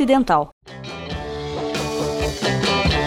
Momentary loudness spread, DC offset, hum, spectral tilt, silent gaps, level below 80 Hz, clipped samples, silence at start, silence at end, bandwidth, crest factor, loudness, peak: 15 LU; under 0.1%; none; -5 dB/octave; 0.52-0.61 s; -34 dBFS; under 0.1%; 0 s; 0 s; 17 kHz; 18 dB; -21 LUFS; -2 dBFS